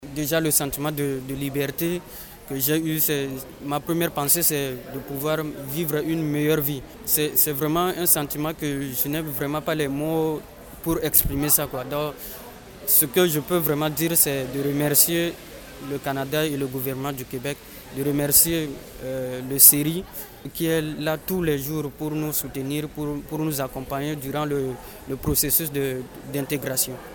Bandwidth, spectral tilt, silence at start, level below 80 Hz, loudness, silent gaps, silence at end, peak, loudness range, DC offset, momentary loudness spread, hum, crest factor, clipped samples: 19.5 kHz; -3.5 dB/octave; 0 s; -46 dBFS; -22 LUFS; none; 0 s; 0 dBFS; 7 LU; under 0.1%; 15 LU; none; 24 dB; under 0.1%